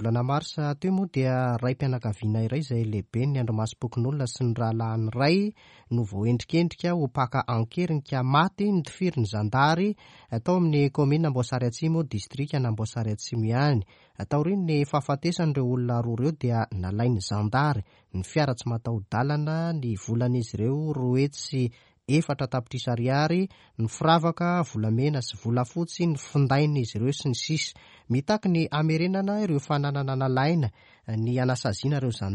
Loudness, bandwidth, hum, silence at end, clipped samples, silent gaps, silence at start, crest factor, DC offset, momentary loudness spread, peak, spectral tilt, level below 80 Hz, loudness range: -26 LUFS; 10 kHz; none; 0 s; under 0.1%; none; 0 s; 18 dB; under 0.1%; 7 LU; -8 dBFS; -6.5 dB/octave; -58 dBFS; 2 LU